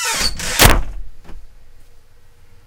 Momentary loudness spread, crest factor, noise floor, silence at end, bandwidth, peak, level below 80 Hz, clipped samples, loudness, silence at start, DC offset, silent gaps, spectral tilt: 24 LU; 18 dB; -42 dBFS; 0.1 s; 18 kHz; 0 dBFS; -24 dBFS; under 0.1%; -14 LUFS; 0 s; under 0.1%; none; -2.5 dB/octave